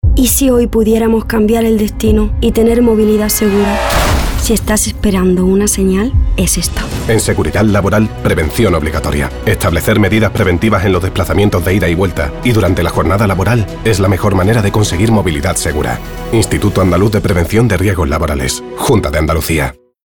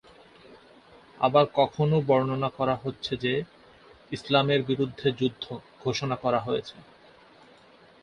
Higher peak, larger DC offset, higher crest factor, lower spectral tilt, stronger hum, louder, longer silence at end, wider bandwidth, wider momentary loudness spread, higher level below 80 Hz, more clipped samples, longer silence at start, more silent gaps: first, 0 dBFS vs -6 dBFS; neither; second, 10 dB vs 22 dB; about the same, -5.5 dB/octave vs -6.5 dB/octave; neither; first, -12 LUFS vs -26 LUFS; second, 0.3 s vs 1.2 s; first, over 20 kHz vs 10 kHz; second, 4 LU vs 14 LU; first, -20 dBFS vs -62 dBFS; neither; second, 0.05 s vs 0.5 s; neither